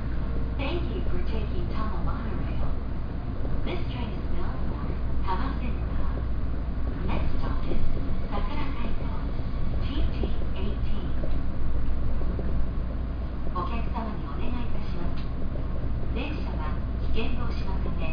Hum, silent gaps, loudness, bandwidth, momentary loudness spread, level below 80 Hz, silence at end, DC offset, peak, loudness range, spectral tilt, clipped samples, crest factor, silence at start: none; none; -32 LUFS; 5.2 kHz; 3 LU; -28 dBFS; 0 s; under 0.1%; -10 dBFS; 1 LU; -9 dB/octave; under 0.1%; 14 dB; 0 s